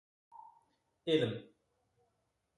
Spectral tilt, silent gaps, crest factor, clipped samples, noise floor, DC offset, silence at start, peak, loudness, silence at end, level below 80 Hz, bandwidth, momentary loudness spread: -6.5 dB/octave; none; 22 dB; under 0.1%; -81 dBFS; under 0.1%; 0.35 s; -18 dBFS; -36 LUFS; 1.15 s; -80 dBFS; 11 kHz; 25 LU